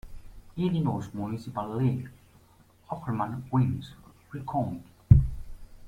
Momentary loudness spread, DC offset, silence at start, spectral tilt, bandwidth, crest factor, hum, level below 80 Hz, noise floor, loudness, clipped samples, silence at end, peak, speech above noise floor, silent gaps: 21 LU; under 0.1%; 0.05 s; -9.5 dB/octave; 9.8 kHz; 26 dB; none; -38 dBFS; -59 dBFS; -28 LUFS; under 0.1%; 0 s; -2 dBFS; 29 dB; none